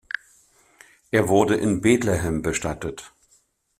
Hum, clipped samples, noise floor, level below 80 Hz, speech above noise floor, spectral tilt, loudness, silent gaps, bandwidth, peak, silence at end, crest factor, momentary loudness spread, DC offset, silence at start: none; under 0.1%; -63 dBFS; -46 dBFS; 42 dB; -5.5 dB/octave; -22 LUFS; none; 16 kHz; -4 dBFS; 0.7 s; 20 dB; 14 LU; under 0.1%; 1.15 s